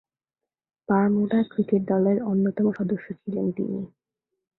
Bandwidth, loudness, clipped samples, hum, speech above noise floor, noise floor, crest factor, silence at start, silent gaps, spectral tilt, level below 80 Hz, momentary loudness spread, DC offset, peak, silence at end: 4 kHz; -24 LUFS; under 0.1%; none; 66 dB; -89 dBFS; 18 dB; 0.9 s; none; -12 dB/octave; -66 dBFS; 9 LU; under 0.1%; -8 dBFS; 0.7 s